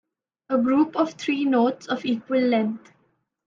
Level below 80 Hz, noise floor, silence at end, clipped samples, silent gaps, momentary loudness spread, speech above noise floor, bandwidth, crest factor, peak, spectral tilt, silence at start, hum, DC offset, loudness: -72 dBFS; -68 dBFS; 0.7 s; under 0.1%; none; 7 LU; 46 dB; 7.6 kHz; 14 dB; -8 dBFS; -5.5 dB/octave; 0.5 s; none; under 0.1%; -23 LUFS